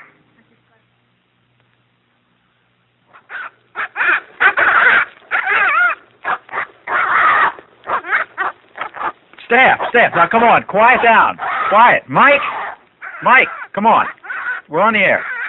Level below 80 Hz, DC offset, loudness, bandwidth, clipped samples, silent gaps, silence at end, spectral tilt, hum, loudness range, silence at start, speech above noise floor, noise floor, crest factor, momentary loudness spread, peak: -56 dBFS; under 0.1%; -13 LUFS; 7 kHz; under 0.1%; none; 0 s; -6.5 dB/octave; none; 6 LU; 3.3 s; 49 dB; -60 dBFS; 16 dB; 15 LU; 0 dBFS